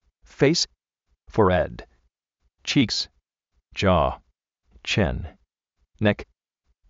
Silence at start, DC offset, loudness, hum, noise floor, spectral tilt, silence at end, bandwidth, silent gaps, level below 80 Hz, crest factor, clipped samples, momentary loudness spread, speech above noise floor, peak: 0.4 s; under 0.1%; -23 LUFS; none; -73 dBFS; -4 dB/octave; 0.65 s; 8 kHz; none; -42 dBFS; 20 dB; under 0.1%; 15 LU; 51 dB; -6 dBFS